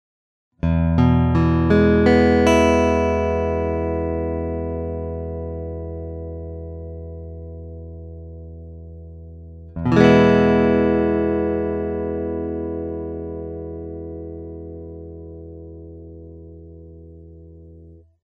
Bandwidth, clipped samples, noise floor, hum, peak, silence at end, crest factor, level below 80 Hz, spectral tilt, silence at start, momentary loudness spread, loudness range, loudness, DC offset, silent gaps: 10 kHz; under 0.1%; -45 dBFS; none; 0 dBFS; 0.25 s; 20 dB; -34 dBFS; -7.5 dB/octave; 0.65 s; 24 LU; 20 LU; -19 LUFS; under 0.1%; none